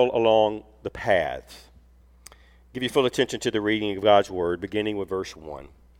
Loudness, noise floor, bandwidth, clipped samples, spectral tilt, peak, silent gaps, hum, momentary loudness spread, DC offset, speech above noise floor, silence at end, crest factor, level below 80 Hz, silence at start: -24 LUFS; -54 dBFS; 16.5 kHz; under 0.1%; -5 dB/octave; -4 dBFS; none; none; 18 LU; under 0.1%; 30 dB; 0.35 s; 20 dB; -52 dBFS; 0 s